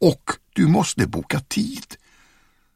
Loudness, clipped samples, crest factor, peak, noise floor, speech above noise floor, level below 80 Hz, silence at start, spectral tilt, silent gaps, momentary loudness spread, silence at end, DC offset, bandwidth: -22 LUFS; under 0.1%; 20 dB; -2 dBFS; -58 dBFS; 38 dB; -48 dBFS; 0 s; -5.5 dB/octave; none; 12 LU; 0.8 s; under 0.1%; 15.5 kHz